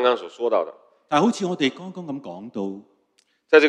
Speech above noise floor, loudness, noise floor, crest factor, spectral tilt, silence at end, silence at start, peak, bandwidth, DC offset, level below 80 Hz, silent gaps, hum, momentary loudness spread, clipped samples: 42 dB; -24 LUFS; -66 dBFS; 22 dB; -5 dB/octave; 0 s; 0 s; 0 dBFS; 9.8 kHz; under 0.1%; -68 dBFS; none; none; 14 LU; under 0.1%